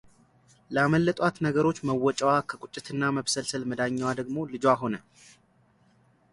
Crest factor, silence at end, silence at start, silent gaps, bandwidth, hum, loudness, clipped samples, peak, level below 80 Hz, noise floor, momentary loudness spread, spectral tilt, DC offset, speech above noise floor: 20 dB; 1.35 s; 0.7 s; none; 11.5 kHz; none; -27 LUFS; under 0.1%; -8 dBFS; -62 dBFS; -64 dBFS; 10 LU; -5 dB/octave; under 0.1%; 37 dB